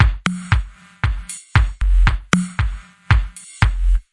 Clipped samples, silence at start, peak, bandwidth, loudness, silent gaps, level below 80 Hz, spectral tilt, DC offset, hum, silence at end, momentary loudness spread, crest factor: under 0.1%; 0 s; 0 dBFS; 11.5 kHz; -20 LUFS; none; -20 dBFS; -5 dB/octave; under 0.1%; none; 0.1 s; 9 LU; 18 dB